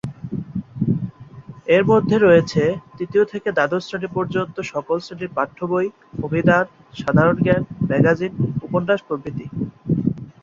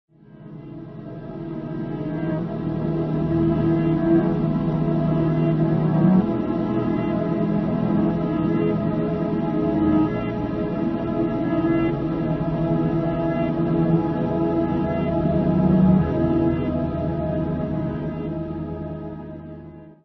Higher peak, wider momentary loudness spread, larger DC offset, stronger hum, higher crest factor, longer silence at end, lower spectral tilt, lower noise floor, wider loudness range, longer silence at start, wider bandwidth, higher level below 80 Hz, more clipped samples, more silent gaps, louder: first, -2 dBFS vs -6 dBFS; about the same, 13 LU vs 13 LU; neither; neither; about the same, 18 dB vs 16 dB; about the same, 0.15 s vs 0.1 s; second, -7.5 dB/octave vs -11 dB/octave; about the same, -39 dBFS vs -42 dBFS; about the same, 4 LU vs 4 LU; second, 0.05 s vs 0.3 s; first, 7.6 kHz vs 5 kHz; second, -50 dBFS vs -40 dBFS; neither; neither; about the same, -20 LUFS vs -22 LUFS